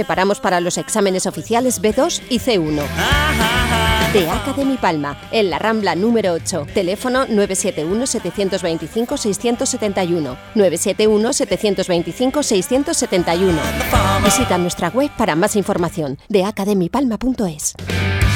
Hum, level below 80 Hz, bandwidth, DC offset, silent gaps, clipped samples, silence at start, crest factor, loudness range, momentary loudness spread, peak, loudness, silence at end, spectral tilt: none; -32 dBFS; over 20 kHz; under 0.1%; none; under 0.1%; 0 s; 16 dB; 2 LU; 5 LU; 0 dBFS; -17 LUFS; 0 s; -4 dB/octave